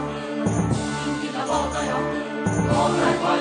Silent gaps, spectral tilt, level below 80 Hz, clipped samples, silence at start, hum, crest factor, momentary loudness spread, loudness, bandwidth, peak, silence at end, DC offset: none; -5.5 dB/octave; -42 dBFS; under 0.1%; 0 s; none; 16 dB; 6 LU; -23 LUFS; 10 kHz; -6 dBFS; 0 s; under 0.1%